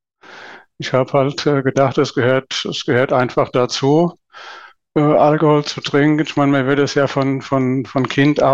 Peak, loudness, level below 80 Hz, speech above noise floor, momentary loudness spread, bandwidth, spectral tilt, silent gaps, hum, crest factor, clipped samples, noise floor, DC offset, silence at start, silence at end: -4 dBFS; -16 LUFS; -54 dBFS; 24 dB; 8 LU; 7.8 kHz; -6 dB/octave; none; none; 12 dB; under 0.1%; -40 dBFS; 0.2%; 0.3 s; 0 s